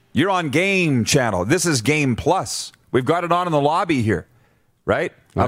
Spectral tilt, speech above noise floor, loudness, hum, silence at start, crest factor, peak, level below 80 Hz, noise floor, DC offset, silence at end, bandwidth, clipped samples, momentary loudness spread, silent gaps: -4.5 dB/octave; 40 dB; -19 LUFS; none; 0.15 s; 18 dB; -2 dBFS; -48 dBFS; -59 dBFS; under 0.1%; 0 s; 16 kHz; under 0.1%; 7 LU; none